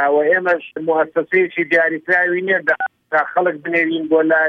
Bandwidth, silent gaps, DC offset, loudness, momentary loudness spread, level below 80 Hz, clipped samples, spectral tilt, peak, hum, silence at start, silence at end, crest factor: 6.2 kHz; none; under 0.1%; -17 LUFS; 5 LU; -68 dBFS; under 0.1%; -7 dB/octave; -4 dBFS; none; 0 s; 0 s; 14 dB